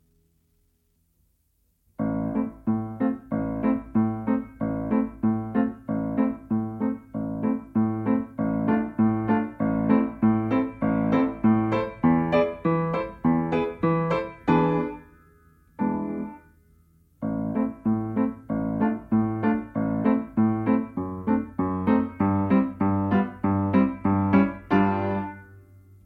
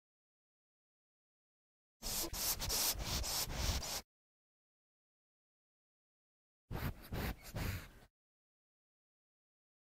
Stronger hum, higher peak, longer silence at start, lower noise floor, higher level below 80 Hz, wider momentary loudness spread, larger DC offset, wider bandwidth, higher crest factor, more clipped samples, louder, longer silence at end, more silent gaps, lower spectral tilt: neither; first, -6 dBFS vs -24 dBFS; about the same, 2 s vs 2 s; second, -69 dBFS vs under -90 dBFS; about the same, -52 dBFS vs -52 dBFS; second, 7 LU vs 11 LU; neither; second, 4.8 kHz vs 16 kHz; about the same, 18 dB vs 22 dB; neither; first, -25 LUFS vs -39 LUFS; second, 0.45 s vs 1.9 s; second, none vs 4.04-6.68 s; first, -10 dB/octave vs -2.5 dB/octave